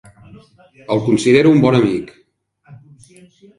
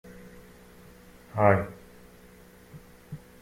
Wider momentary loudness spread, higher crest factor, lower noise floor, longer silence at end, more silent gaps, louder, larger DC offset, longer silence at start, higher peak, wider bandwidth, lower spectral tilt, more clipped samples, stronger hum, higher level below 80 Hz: second, 13 LU vs 27 LU; second, 16 dB vs 24 dB; about the same, -53 dBFS vs -52 dBFS; first, 0.85 s vs 0.25 s; neither; first, -14 LUFS vs -26 LUFS; neither; first, 0.9 s vs 0.05 s; first, 0 dBFS vs -6 dBFS; second, 11.5 kHz vs 16.5 kHz; second, -6.5 dB/octave vs -8 dB/octave; neither; neither; first, -52 dBFS vs -58 dBFS